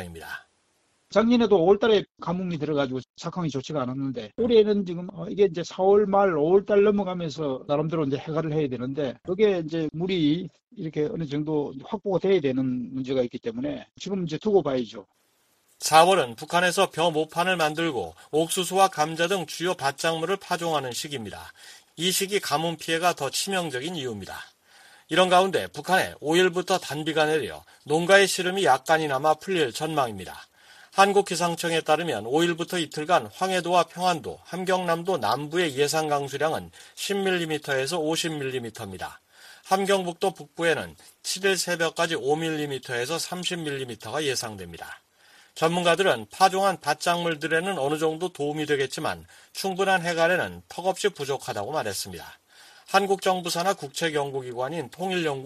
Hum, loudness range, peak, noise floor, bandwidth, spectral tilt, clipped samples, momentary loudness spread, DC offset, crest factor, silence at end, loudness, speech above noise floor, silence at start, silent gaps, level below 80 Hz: none; 5 LU; -4 dBFS; -68 dBFS; 15 kHz; -4 dB/octave; under 0.1%; 13 LU; under 0.1%; 22 dB; 0 s; -25 LUFS; 43 dB; 0 s; 3.10-3.14 s; -62 dBFS